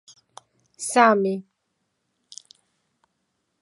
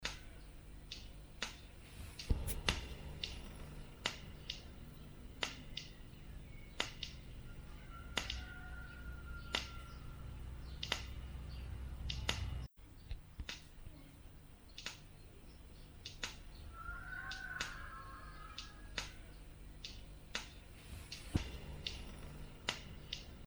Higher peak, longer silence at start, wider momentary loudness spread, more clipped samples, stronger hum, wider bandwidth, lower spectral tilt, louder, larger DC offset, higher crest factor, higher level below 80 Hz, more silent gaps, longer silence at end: first, -2 dBFS vs -12 dBFS; first, 0.8 s vs 0 s; first, 27 LU vs 15 LU; neither; neither; second, 11.5 kHz vs over 20 kHz; about the same, -4 dB/octave vs -3 dB/octave; first, -20 LUFS vs -46 LUFS; neither; second, 26 dB vs 34 dB; second, -82 dBFS vs -50 dBFS; neither; first, 2.2 s vs 0 s